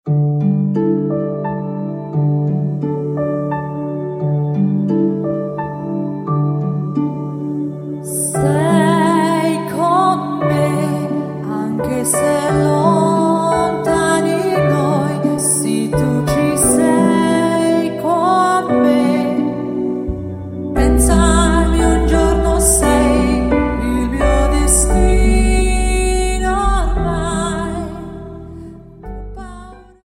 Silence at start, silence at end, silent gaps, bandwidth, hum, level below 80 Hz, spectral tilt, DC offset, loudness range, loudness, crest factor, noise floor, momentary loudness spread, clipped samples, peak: 0.05 s; 0.2 s; none; 16.5 kHz; none; -22 dBFS; -5.5 dB/octave; under 0.1%; 6 LU; -16 LUFS; 14 dB; -36 dBFS; 10 LU; under 0.1%; 0 dBFS